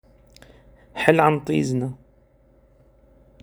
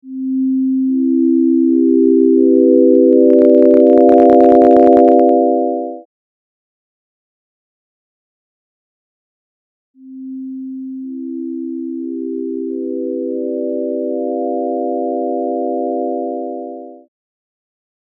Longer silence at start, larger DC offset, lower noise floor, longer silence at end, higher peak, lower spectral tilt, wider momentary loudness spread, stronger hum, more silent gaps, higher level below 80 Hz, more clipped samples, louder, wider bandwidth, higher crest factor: first, 0.95 s vs 0.05 s; neither; second, -57 dBFS vs under -90 dBFS; first, 1.45 s vs 1.2 s; about the same, 0 dBFS vs 0 dBFS; second, -6.5 dB/octave vs -9.5 dB/octave; about the same, 19 LU vs 19 LU; neither; second, none vs 6.05-9.94 s; about the same, -56 dBFS vs -58 dBFS; neither; second, -21 LUFS vs -13 LUFS; first, over 20 kHz vs 3.4 kHz; first, 24 dB vs 14 dB